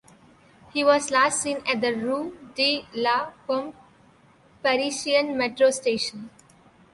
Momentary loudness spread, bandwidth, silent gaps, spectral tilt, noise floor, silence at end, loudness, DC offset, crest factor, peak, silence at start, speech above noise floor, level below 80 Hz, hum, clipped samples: 10 LU; 11.5 kHz; none; -2 dB/octave; -56 dBFS; 0.65 s; -24 LUFS; under 0.1%; 20 dB; -6 dBFS; 0.75 s; 32 dB; -66 dBFS; none; under 0.1%